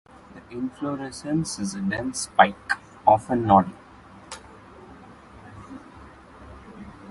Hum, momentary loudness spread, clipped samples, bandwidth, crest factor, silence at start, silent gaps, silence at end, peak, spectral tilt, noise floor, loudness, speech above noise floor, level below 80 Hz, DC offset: none; 25 LU; under 0.1%; 11.5 kHz; 26 dB; 0.3 s; none; 0 s; 0 dBFS; -5 dB/octave; -47 dBFS; -23 LUFS; 24 dB; -52 dBFS; under 0.1%